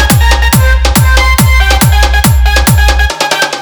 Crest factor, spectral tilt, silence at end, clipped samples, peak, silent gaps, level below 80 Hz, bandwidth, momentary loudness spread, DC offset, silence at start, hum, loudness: 6 dB; -4 dB/octave; 0 s; 1%; 0 dBFS; none; -10 dBFS; over 20 kHz; 3 LU; under 0.1%; 0 s; none; -7 LUFS